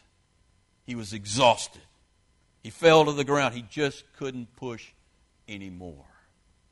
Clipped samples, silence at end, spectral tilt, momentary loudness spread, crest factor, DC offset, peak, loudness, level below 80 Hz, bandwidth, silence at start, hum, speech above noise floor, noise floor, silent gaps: under 0.1%; 0.75 s; -4 dB/octave; 23 LU; 22 dB; under 0.1%; -6 dBFS; -25 LUFS; -60 dBFS; 11.5 kHz; 0.9 s; none; 40 dB; -66 dBFS; none